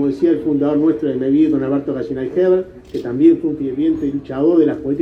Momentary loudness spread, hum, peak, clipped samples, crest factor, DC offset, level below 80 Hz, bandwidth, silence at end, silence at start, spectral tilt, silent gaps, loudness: 9 LU; none; -2 dBFS; under 0.1%; 14 dB; under 0.1%; -48 dBFS; 5.4 kHz; 0 s; 0 s; -9.5 dB/octave; none; -17 LUFS